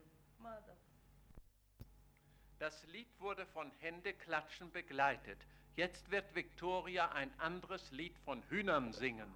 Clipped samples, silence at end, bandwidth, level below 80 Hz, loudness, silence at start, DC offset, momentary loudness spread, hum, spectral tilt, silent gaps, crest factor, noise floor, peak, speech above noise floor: under 0.1%; 0 s; over 20 kHz; -66 dBFS; -43 LUFS; 0 s; under 0.1%; 17 LU; none; -5 dB/octave; none; 22 dB; -67 dBFS; -24 dBFS; 24 dB